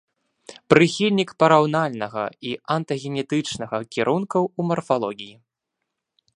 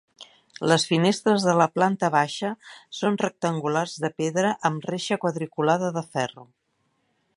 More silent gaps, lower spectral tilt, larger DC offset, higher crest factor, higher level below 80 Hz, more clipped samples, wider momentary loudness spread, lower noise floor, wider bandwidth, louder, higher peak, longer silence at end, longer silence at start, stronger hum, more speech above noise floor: neither; about the same, -5.5 dB/octave vs -5 dB/octave; neither; about the same, 22 dB vs 22 dB; first, -64 dBFS vs -72 dBFS; neither; first, 12 LU vs 9 LU; first, -81 dBFS vs -72 dBFS; about the same, 11 kHz vs 11.5 kHz; about the same, -22 LUFS vs -24 LUFS; first, 0 dBFS vs -4 dBFS; about the same, 1.05 s vs 0.95 s; first, 0.5 s vs 0.2 s; neither; first, 60 dB vs 48 dB